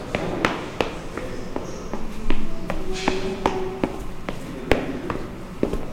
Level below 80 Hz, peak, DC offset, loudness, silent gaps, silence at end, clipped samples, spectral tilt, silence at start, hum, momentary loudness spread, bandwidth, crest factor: -32 dBFS; -2 dBFS; under 0.1%; -28 LUFS; none; 0 s; under 0.1%; -5.5 dB/octave; 0 s; none; 9 LU; 10.5 kHz; 22 dB